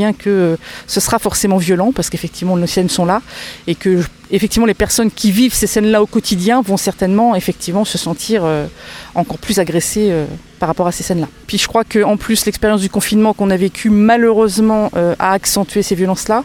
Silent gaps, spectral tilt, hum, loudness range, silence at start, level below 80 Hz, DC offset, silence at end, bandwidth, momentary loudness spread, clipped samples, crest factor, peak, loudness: none; -4.5 dB/octave; none; 4 LU; 0 s; -38 dBFS; under 0.1%; 0 s; 19 kHz; 8 LU; under 0.1%; 14 dB; 0 dBFS; -14 LUFS